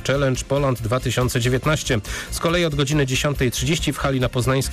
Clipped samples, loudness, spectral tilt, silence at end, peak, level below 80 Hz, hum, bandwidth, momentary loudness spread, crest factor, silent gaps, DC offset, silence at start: under 0.1%; -21 LUFS; -5 dB/octave; 0 s; -12 dBFS; -34 dBFS; none; 15.5 kHz; 3 LU; 10 dB; none; under 0.1%; 0 s